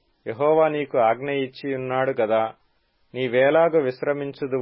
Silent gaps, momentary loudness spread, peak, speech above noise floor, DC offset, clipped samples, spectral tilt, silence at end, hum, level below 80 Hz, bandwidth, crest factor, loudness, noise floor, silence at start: none; 11 LU; -6 dBFS; 44 dB; under 0.1%; under 0.1%; -10.5 dB/octave; 0 s; none; -70 dBFS; 5.8 kHz; 16 dB; -22 LUFS; -65 dBFS; 0.25 s